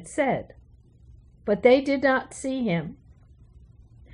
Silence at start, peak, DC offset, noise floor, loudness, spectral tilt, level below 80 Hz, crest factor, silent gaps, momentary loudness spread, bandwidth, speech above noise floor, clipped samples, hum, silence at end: 0 s; -6 dBFS; under 0.1%; -53 dBFS; -24 LUFS; -5.5 dB/octave; -54 dBFS; 22 dB; none; 12 LU; 10.5 kHz; 30 dB; under 0.1%; none; 1.2 s